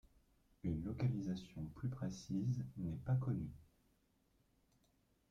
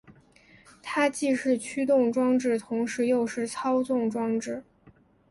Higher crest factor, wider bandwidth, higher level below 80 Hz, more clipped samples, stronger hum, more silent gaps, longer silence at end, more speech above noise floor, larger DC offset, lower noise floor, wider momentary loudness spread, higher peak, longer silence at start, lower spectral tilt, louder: about the same, 16 dB vs 16 dB; second, 7.4 kHz vs 11.5 kHz; about the same, -64 dBFS vs -68 dBFS; neither; neither; neither; first, 1.7 s vs 0.7 s; first, 36 dB vs 32 dB; neither; first, -77 dBFS vs -58 dBFS; about the same, 8 LU vs 8 LU; second, -28 dBFS vs -10 dBFS; first, 0.65 s vs 0.1 s; first, -8 dB/octave vs -4.5 dB/octave; second, -43 LUFS vs -26 LUFS